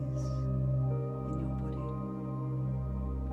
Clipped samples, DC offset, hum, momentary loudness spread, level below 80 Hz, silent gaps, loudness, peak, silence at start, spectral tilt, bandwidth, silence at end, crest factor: under 0.1%; under 0.1%; none; 6 LU; -42 dBFS; none; -35 LUFS; -22 dBFS; 0 s; -10 dB/octave; 6.4 kHz; 0 s; 10 dB